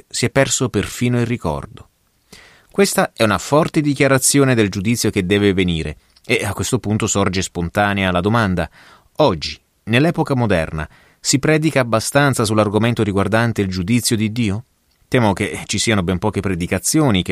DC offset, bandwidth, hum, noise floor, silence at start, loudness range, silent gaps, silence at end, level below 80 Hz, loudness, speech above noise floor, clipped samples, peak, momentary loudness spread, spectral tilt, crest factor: under 0.1%; 15.5 kHz; none; -48 dBFS; 0.15 s; 3 LU; none; 0 s; -42 dBFS; -17 LUFS; 31 dB; under 0.1%; -2 dBFS; 8 LU; -4.5 dB/octave; 16 dB